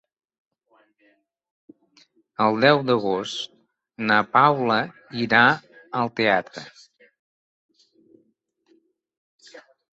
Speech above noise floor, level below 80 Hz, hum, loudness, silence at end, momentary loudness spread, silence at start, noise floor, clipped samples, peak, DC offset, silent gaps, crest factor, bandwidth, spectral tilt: 48 dB; -66 dBFS; none; -21 LUFS; 0.35 s; 18 LU; 2.4 s; -68 dBFS; under 0.1%; -2 dBFS; under 0.1%; 7.19-7.69 s, 9.17-9.39 s; 22 dB; 8.2 kHz; -5.5 dB/octave